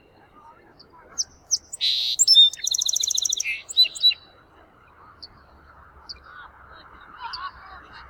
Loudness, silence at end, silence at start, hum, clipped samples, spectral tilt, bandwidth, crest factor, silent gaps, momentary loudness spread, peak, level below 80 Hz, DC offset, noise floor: -18 LUFS; 0.05 s; 1.15 s; none; under 0.1%; 3.5 dB/octave; 19.5 kHz; 20 dB; none; 26 LU; -6 dBFS; -58 dBFS; under 0.1%; -53 dBFS